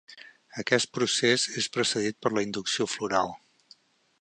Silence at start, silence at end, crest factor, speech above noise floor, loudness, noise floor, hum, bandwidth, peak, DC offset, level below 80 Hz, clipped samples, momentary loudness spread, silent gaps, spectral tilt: 0.1 s; 0.85 s; 22 dB; 32 dB; -27 LUFS; -59 dBFS; none; 10 kHz; -6 dBFS; under 0.1%; -68 dBFS; under 0.1%; 10 LU; none; -2.5 dB/octave